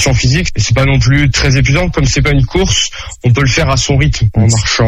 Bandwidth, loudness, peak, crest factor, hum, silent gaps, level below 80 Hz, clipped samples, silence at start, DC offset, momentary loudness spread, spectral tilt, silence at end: 11 kHz; -11 LUFS; 0 dBFS; 10 dB; none; none; -20 dBFS; under 0.1%; 0 s; under 0.1%; 3 LU; -4.5 dB/octave; 0 s